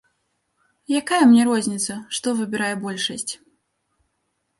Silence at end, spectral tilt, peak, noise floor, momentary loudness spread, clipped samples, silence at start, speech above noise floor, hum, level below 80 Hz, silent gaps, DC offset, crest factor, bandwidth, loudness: 1.25 s; -3.5 dB/octave; -4 dBFS; -73 dBFS; 13 LU; under 0.1%; 0.9 s; 53 dB; none; -68 dBFS; none; under 0.1%; 18 dB; 11.5 kHz; -20 LUFS